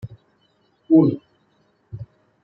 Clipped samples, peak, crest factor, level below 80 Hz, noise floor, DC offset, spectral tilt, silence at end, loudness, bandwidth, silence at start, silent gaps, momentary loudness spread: under 0.1%; -4 dBFS; 20 dB; -60 dBFS; -63 dBFS; under 0.1%; -12.5 dB/octave; 0.4 s; -17 LUFS; 4.3 kHz; 0.05 s; none; 25 LU